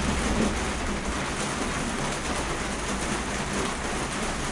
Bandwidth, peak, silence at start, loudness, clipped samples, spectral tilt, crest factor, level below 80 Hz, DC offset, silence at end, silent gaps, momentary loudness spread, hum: 11.5 kHz; -12 dBFS; 0 s; -28 LUFS; under 0.1%; -3.5 dB/octave; 16 dB; -36 dBFS; under 0.1%; 0 s; none; 3 LU; none